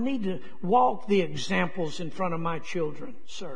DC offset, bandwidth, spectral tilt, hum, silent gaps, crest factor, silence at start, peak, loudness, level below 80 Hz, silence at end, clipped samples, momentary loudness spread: 3%; 10 kHz; -6 dB/octave; none; none; 18 dB; 0 s; -10 dBFS; -28 LUFS; -62 dBFS; 0 s; under 0.1%; 12 LU